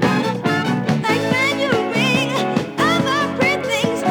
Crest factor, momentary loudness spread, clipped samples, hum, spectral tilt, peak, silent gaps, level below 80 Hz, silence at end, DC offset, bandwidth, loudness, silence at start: 16 dB; 3 LU; under 0.1%; none; -5 dB/octave; -2 dBFS; none; -56 dBFS; 0 s; under 0.1%; over 20 kHz; -18 LUFS; 0 s